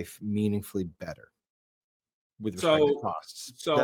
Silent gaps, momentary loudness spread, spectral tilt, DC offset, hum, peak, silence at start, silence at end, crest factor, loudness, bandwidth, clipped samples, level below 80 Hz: 1.50-2.00 s, 2.13-2.30 s; 18 LU; -5.5 dB/octave; under 0.1%; none; -10 dBFS; 0 s; 0 s; 20 dB; -29 LUFS; 17.5 kHz; under 0.1%; -64 dBFS